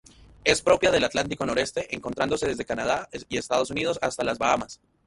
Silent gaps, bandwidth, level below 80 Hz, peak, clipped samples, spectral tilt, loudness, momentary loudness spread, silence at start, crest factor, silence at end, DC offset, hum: none; 11.5 kHz; -52 dBFS; -4 dBFS; under 0.1%; -3.5 dB/octave; -25 LUFS; 10 LU; 0.45 s; 22 dB; 0.3 s; under 0.1%; none